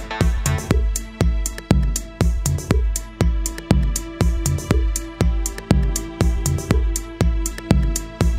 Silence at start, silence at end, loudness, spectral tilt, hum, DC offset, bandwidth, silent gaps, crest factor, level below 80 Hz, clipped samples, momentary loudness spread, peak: 0 s; 0 s; -21 LUFS; -5.5 dB/octave; none; under 0.1%; 16 kHz; none; 18 dB; -22 dBFS; under 0.1%; 5 LU; -2 dBFS